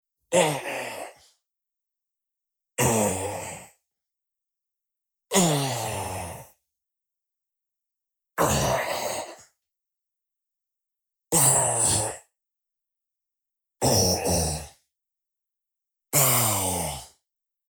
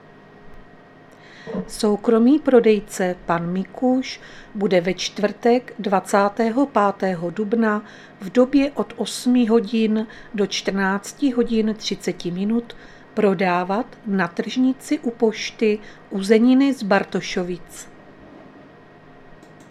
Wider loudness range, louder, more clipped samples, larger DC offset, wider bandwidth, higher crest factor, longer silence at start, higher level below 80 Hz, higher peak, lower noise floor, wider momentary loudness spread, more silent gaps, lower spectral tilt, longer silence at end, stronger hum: first, 6 LU vs 3 LU; second, -23 LUFS vs -20 LUFS; neither; neither; first, 19 kHz vs 13.5 kHz; about the same, 22 dB vs 20 dB; second, 0.3 s vs 0.45 s; about the same, -50 dBFS vs -52 dBFS; second, -6 dBFS vs -2 dBFS; first, -87 dBFS vs -46 dBFS; first, 18 LU vs 13 LU; neither; second, -3 dB/octave vs -5.5 dB/octave; second, 0.65 s vs 1.1 s; neither